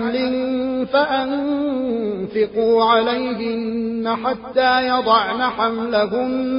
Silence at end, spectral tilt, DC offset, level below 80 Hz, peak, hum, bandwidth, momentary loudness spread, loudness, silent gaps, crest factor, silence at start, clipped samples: 0 s; -9 dB/octave; under 0.1%; -54 dBFS; -2 dBFS; none; 5.4 kHz; 7 LU; -19 LUFS; none; 16 dB; 0 s; under 0.1%